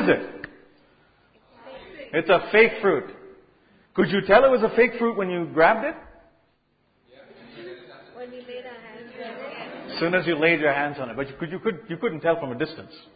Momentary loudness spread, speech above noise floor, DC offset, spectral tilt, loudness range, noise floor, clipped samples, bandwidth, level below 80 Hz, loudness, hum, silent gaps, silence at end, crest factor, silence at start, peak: 24 LU; 45 dB; under 0.1%; -10 dB/octave; 18 LU; -67 dBFS; under 0.1%; 5 kHz; -58 dBFS; -22 LUFS; none; none; 0.15 s; 22 dB; 0 s; -2 dBFS